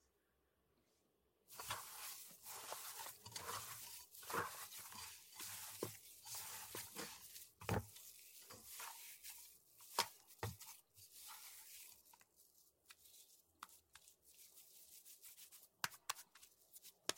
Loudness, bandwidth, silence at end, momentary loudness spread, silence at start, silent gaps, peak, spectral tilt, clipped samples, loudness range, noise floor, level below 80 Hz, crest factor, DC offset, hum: -51 LUFS; 16.5 kHz; 0 s; 18 LU; 1.5 s; none; -20 dBFS; -2 dB/octave; under 0.1%; 12 LU; -83 dBFS; -76 dBFS; 34 dB; under 0.1%; none